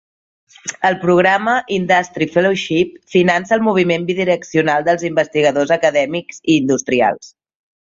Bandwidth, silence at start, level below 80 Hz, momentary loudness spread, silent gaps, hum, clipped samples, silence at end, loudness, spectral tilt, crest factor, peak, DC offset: 7.8 kHz; 0.65 s; -56 dBFS; 5 LU; none; none; under 0.1%; 0.55 s; -15 LUFS; -5 dB/octave; 14 dB; -2 dBFS; under 0.1%